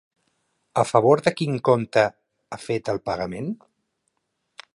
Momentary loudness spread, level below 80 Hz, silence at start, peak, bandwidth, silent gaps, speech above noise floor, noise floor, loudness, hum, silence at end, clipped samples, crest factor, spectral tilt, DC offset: 15 LU; -60 dBFS; 0.75 s; -2 dBFS; 11.5 kHz; none; 54 dB; -76 dBFS; -22 LUFS; none; 1.2 s; under 0.1%; 22 dB; -6 dB/octave; under 0.1%